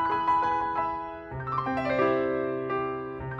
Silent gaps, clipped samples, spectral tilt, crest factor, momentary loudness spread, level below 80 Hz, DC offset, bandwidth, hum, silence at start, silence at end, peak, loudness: none; under 0.1%; -8 dB/octave; 16 dB; 10 LU; -54 dBFS; under 0.1%; 7.4 kHz; none; 0 s; 0 s; -12 dBFS; -28 LUFS